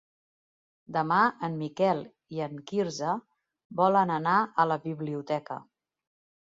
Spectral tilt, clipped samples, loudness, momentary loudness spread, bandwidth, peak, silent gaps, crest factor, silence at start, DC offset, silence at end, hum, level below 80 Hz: -6 dB/octave; under 0.1%; -28 LUFS; 12 LU; 7.8 kHz; -10 dBFS; 3.65-3.70 s; 20 dB; 0.9 s; under 0.1%; 0.85 s; none; -74 dBFS